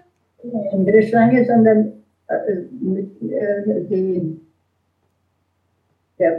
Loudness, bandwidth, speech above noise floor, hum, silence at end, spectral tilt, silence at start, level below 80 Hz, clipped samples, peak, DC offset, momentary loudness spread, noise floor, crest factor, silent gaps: -18 LUFS; 5.4 kHz; 50 dB; none; 0 s; -10.5 dB/octave; 0.45 s; -64 dBFS; under 0.1%; -2 dBFS; under 0.1%; 13 LU; -67 dBFS; 16 dB; none